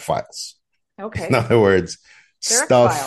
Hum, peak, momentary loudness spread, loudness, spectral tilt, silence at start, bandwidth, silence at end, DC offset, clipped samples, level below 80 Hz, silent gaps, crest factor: none; -2 dBFS; 18 LU; -17 LUFS; -4 dB/octave; 0 s; 12.5 kHz; 0 s; under 0.1%; under 0.1%; -52 dBFS; none; 16 dB